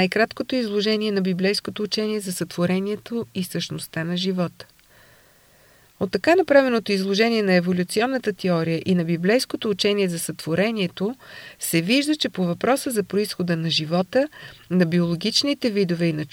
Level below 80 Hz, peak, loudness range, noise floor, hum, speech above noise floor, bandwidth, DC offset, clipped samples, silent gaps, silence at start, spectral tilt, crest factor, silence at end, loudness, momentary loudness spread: -62 dBFS; -4 dBFS; 6 LU; -55 dBFS; none; 33 dB; 17 kHz; under 0.1%; under 0.1%; none; 0 s; -5 dB/octave; 18 dB; 0.05 s; -22 LUFS; 9 LU